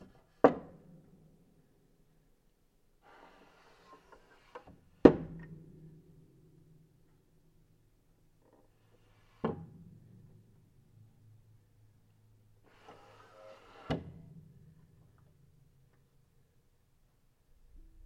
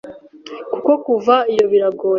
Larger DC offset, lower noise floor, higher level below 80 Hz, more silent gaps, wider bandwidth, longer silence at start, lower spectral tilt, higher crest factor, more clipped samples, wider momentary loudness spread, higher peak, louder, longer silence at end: neither; first, -70 dBFS vs -36 dBFS; about the same, -60 dBFS vs -64 dBFS; neither; about the same, 7.4 kHz vs 7.4 kHz; first, 0.45 s vs 0.05 s; first, -8.5 dB/octave vs -5.5 dB/octave; first, 36 dB vs 14 dB; neither; first, 33 LU vs 15 LU; about the same, -2 dBFS vs -2 dBFS; second, -30 LUFS vs -16 LUFS; first, 4.05 s vs 0 s